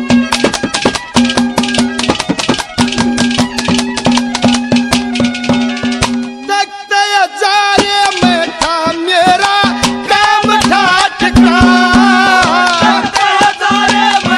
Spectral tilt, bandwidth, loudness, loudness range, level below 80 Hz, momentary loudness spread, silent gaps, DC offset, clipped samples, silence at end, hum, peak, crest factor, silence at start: -3.5 dB/octave; 13.5 kHz; -10 LUFS; 4 LU; -32 dBFS; 6 LU; none; under 0.1%; 0.3%; 0 s; none; 0 dBFS; 10 dB; 0 s